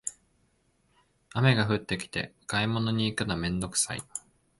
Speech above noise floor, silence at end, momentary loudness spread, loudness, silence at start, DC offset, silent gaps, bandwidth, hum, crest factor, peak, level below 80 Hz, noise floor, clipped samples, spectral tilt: 41 dB; 0.4 s; 13 LU; -29 LUFS; 0.05 s; under 0.1%; none; 11.5 kHz; none; 20 dB; -10 dBFS; -54 dBFS; -69 dBFS; under 0.1%; -4 dB/octave